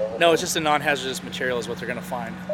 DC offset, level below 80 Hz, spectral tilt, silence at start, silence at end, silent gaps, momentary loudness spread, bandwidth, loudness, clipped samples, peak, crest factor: under 0.1%; -56 dBFS; -3.5 dB/octave; 0 s; 0 s; none; 10 LU; 17 kHz; -23 LUFS; under 0.1%; -4 dBFS; 20 dB